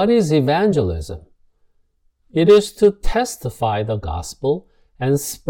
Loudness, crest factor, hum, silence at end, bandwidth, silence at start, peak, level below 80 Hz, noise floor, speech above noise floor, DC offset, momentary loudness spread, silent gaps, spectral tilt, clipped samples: -18 LUFS; 18 dB; none; 0 s; 17.5 kHz; 0 s; 0 dBFS; -34 dBFS; -61 dBFS; 44 dB; under 0.1%; 13 LU; none; -6 dB/octave; under 0.1%